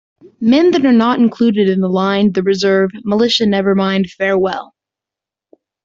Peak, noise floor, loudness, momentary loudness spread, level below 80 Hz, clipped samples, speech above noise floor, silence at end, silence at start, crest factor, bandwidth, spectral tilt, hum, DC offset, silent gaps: -2 dBFS; -86 dBFS; -13 LUFS; 5 LU; -54 dBFS; under 0.1%; 73 dB; 1.2 s; 0.4 s; 12 dB; 7.6 kHz; -6 dB/octave; none; under 0.1%; none